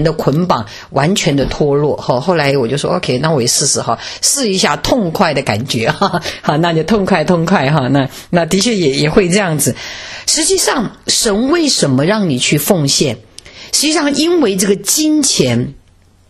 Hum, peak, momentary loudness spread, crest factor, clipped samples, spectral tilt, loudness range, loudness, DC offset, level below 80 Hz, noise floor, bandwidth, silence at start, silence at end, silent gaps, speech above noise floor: none; 0 dBFS; 5 LU; 14 dB; under 0.1%; -4 dB/octave; 1 LU; -13 LUFS; under 0.1%; -38 dBFS; -47 dBFS; 14 kHz; 0 s; 0.5 s; none; 34 dB